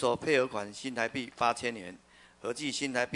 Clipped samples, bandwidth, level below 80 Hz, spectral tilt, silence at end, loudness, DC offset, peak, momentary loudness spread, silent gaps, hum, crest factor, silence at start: under 0.1%; 11 kHz; -68 dBFS; -3.5 dB/octave; 0 s; -32 LUFS; under 0.1%; -12 dBFS; 12 LU; none; none; 20 dB; 0 s